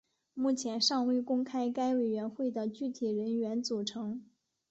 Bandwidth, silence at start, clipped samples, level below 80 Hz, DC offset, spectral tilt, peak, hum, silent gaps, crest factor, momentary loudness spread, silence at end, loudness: 8.2 kHz; 0.35 s; under 0.1%; -78 dBFS; under 0.1%; -4 dB/octave; -16 dBFS; none; none; 16 dB; 8 LU; 0.45 s; -33 LUFS